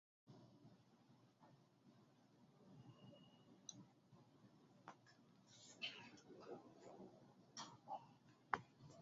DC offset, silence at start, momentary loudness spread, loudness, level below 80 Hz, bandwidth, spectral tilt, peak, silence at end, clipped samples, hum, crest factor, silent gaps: under 0.1%; 0.25 s; 20 LU; -57 LUFS; under -90 dBFS; 7.4 kHz; -2 dB/octave; -20 dBFS; 0 s; under 0.1%; none; 40 dB; none